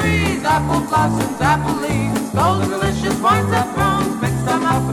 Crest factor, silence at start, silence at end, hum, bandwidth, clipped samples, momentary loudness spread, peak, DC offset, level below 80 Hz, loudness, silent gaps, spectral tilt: 14 dB; 0 s; 0 s; none; 17.5 kHz; under 0.1%; 4 LU; -4 dBFS; under 0.1%; -34 dBFS; -17 LUFS; none; -5.5 dB/octave